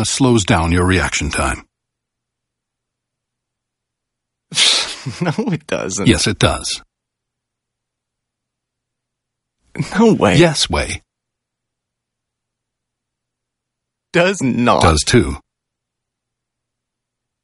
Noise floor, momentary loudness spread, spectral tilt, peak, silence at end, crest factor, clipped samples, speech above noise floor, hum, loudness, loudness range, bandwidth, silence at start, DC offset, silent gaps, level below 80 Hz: -80 dBFS; 12 LU; -4 dB/octave; 0 dBFS; 2.05 s; 18 dB; under 0.1%; 66 dB; none; -15 LUFS; 9 LU; 11.5 kHz; 0 s; under 0.1%; none; -34 dBFS